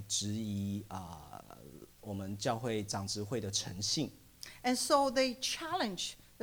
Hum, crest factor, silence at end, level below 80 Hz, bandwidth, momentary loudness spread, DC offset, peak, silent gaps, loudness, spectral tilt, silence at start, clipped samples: 60 Hz at -65 dBFS; 22 dB; 0.15 s; -64 dBFS; over 20 kHz; 21 LU; under 0.1%; -16 dBFS; none; -35 LUFS; -3.5 dB/octave; 0 s; under 0.1%